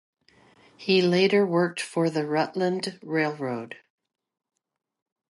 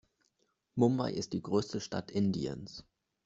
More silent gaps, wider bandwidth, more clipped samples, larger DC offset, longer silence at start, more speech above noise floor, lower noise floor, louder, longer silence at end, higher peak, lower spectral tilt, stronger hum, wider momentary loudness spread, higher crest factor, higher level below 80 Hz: neither; first, 11.5 kHz vs 8 kHz; neither; neither; about the same, 0.8 s vs 0.75 s; second, 34 dB vs 45 dB; second, -59 dBFS vs -78 dBFS; first, -25 LUFS vs -34 LUFS; first, 1.6 s vs 0.45 s; first, -10 dBFS vs -14 dBFS; about the same, -5.5 dB/octave vs -6.5 dB/octave; neither; about the same, 14 LU vs 14 LU; about the same, 18 dB vs 22 dB; second, -76 dBFS vs -66 dBFS